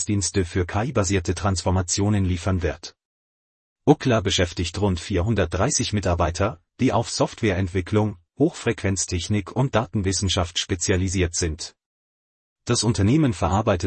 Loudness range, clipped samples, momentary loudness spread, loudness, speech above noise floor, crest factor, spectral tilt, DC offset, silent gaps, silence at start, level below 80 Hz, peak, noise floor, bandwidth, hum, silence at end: 2 LU; under 0.1%; 5 LU; -23 LUFS; over 68 dB; 20 dB; -5 dB/octave; under 0.1%; 3.05-3.76 s, 11.86-12.56 s; 0 s; -44 dBFS; -2 dBFS; under -90 dBFS; 8.8 kHz; none; 0 s